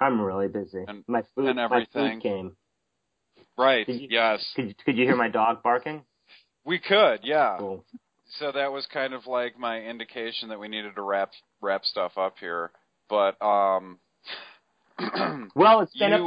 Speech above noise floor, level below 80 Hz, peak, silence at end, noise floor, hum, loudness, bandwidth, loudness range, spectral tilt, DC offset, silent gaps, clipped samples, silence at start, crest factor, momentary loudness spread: 54 dB; -68 dBFS; -6 dBFS; 0 s; -79 dBFS; none; -25 LUFS; 5.2 kHz; 6 LU; -8 dB/octave; under 0.1%; none; under 0.1%; 0 s; 20 dB; 16 LU